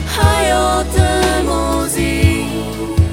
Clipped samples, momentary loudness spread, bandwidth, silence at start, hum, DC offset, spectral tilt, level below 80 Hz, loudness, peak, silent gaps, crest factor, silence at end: under 0.1%; 6 LU; 17 kHz; 0 s; none; under 0.1%; -5 dB/octave; -22 dBFS; -15 LUFS; 0 dBFS; none; 14 dB; 0 s